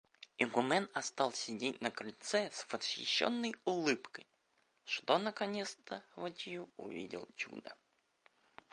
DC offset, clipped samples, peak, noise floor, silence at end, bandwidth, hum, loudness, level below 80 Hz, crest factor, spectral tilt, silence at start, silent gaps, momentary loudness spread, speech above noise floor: under 0.1%; under 0.1%; -14 dBFS; -77 dBFS; 1 s; 11 kHz; none; -38 LUFS; -86 dBFS; 26 dB; -3 dB/octave; 0.2 s; none; 14 LU; 39 dB